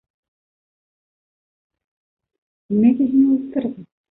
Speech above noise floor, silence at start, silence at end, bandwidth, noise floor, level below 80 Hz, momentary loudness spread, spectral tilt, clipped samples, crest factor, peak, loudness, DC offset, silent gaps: over 73 dB; 2.7 s; 0.3 s; 3.9 kHz; under -90 dBFS; -64 dBFS; 10 LU; -12.5 dB/octave; under 0.1%; 18 dB; -4 dBFS; -18 LUFS; under 0.1%; none